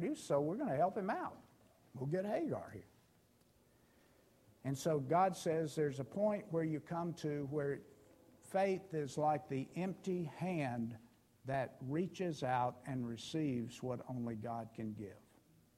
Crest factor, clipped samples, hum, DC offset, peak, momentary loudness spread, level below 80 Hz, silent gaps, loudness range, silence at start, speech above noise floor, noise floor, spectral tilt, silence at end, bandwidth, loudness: 18 dB; under 0.1%; none; under 0.1%; -22 dBFS; 10 LU; -76 dBFS; none; 5 LU; 0 s; 32 dB; -71 dBFS; -6.5 dB/octave; 0.6 s; 16 kHz; -40 LUFS